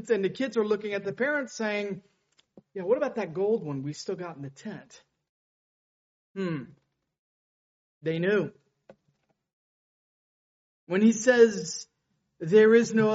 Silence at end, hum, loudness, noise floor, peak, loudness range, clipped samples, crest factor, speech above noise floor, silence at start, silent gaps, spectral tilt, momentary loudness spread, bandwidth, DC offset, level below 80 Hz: 0 s; none; -26 LUFS; -74 dBFS; -6 dBFS; 14 LU; under 0.1%; 22 dB; 48 dB; 0 s; 5.29-6.34 s, 7.19-8.01 s, 9.53-10.87 s; -5 dB/octave; 19 LU; 8 kHz; under 0.1%; -74 dBFS